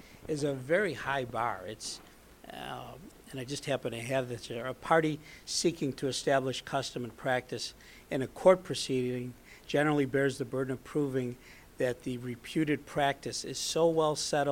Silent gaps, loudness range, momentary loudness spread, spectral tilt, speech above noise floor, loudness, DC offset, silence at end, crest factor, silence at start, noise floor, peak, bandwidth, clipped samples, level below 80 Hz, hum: none; 6 LU; 14 LU; -4.5 dB/octave; 20 dB; -32 LUFS; under 0.1%; 0 s; 22 dB; 0.05 s; -51 dBFS; -10 dBFS; 17 kHz; under 0.1%; -60 dBFS; none